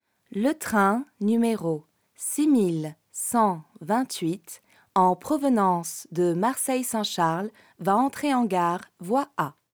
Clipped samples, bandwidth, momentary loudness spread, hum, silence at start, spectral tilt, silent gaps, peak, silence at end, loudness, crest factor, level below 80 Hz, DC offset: under 0.1%; over 20 kHz; 11 LU; none; 0.3 s; -5 dB/octave; none; -8 dBFS; 0.25 s; -25 LUFS; 18 dB; -72 dBFS; under 0.1%